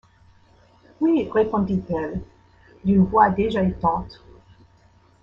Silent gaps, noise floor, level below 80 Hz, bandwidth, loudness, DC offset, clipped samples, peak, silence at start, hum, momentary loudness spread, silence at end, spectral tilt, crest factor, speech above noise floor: none; -56 dBFS; -46 dBFS; 5.6 kHz; -21 LUFS; under 0.1%; under 0.1%; -4 dBFS; 1 s; none; 12 LU; 1.1 s; -9.5 dB/octave; 20 dB; 35 dB